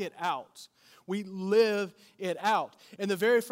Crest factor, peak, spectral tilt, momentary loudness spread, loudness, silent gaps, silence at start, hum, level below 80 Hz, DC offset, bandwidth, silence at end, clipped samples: 16 dB; -14 dBFS; -5 dB/octave; 14 LU; -30 LUFS; none; 0 s; none; -86 dBFS; under 0.1%; 16 kHz; 0 s; under 0.1%